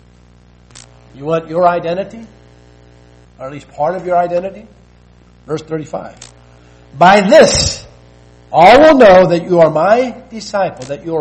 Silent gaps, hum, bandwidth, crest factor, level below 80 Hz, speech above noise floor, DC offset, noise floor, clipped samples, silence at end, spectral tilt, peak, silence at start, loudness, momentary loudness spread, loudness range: none; 60 Hz at -45 dBFS; 9.4 kHz; 12 dB; -38 dBFS; 34 dB; under 0.1%; -44 dBFS; 0.5%; 0 s; -4.5 dB/octave; 0 dBFS; 1.2 s; -10 LUFS; 22 LU; 13 LU